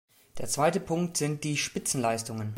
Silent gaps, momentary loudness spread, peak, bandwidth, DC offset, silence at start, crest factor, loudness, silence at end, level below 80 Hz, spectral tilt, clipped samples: none; 6 LU; -12 dBFS; 16.5 kHz; under 0.1%; 0.35 s; 18 dB; -29 LUFS; 0 s; -60 dBFS; -4 dB/octave; under 0.1%